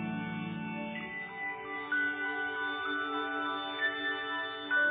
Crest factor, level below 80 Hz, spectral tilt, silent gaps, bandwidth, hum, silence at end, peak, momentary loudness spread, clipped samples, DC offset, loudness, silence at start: 14 dB; -70 dBFS; -1.5 dB/octave; none; 4.7 kHz; none; 0 s; -20 dBFS; 7 LU; under 0.1%; under 0.1%; -34 LUFS; 0 s